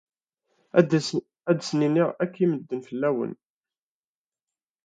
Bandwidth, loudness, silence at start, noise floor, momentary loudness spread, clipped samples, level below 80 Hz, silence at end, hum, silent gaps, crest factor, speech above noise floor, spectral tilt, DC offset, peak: 9.2 kHz; -25 LUFS; 0.75 s; under -90 dBFS; 9 LU; under 0.1%; -74 dBFS; 1.5 s; none; none; 24 dB; over 66 dB; -6.5 dB/octave; under 0.1%; -4 dBFS